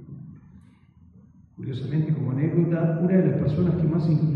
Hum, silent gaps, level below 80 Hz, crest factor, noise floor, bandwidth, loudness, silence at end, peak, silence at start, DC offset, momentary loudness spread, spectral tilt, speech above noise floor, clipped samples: none; none; -52 dBFS; 14 dB; -53 dBFS; 5.2 kHz; -23 LUFS; 0 s; -10 dBFS; 0 s; under 0.1%; 17 LU; -11.5 dB/octave; 31 dB; under 0.1%